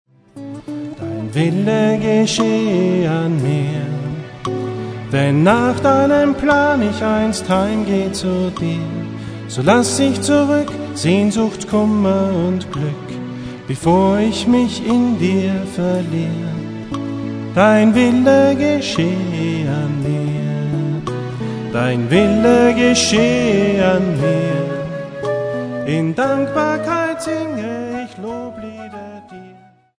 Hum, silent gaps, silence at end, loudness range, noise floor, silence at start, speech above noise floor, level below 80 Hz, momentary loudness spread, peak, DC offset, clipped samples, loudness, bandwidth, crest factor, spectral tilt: none; none; 0.45 s; 5 LU; -45 dBFS; 0.35 s; 30 dB; -44 dBFS; 14 LU; 0 dBFS; under 0.1%; under 0.1%; -16 LUFS; 11 kHz; 16 dB; -6 dB/octave